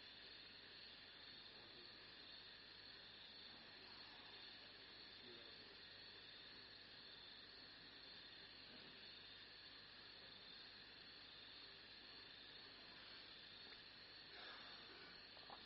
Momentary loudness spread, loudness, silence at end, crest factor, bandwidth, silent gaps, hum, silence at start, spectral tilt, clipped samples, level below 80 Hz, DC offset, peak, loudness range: 1 LU; -58 LUFS; 0 s; 18 dB; 5.6 kHz; none; none; 0 s; 0 dB/octave; under 0.1%; -82 dBFS; under 0.1%; -44 dBFS; 1 LU